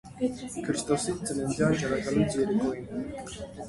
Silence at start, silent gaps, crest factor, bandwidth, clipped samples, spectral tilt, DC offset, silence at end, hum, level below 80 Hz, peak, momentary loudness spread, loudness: 0.05 s; none; 18 dB; 11.5 kHz; under 0.1%; -5.5 dB/octave; under 0.1%; 0 s; none; -52 dBFS; -12 dBFS; 10 LU; -29 LUFS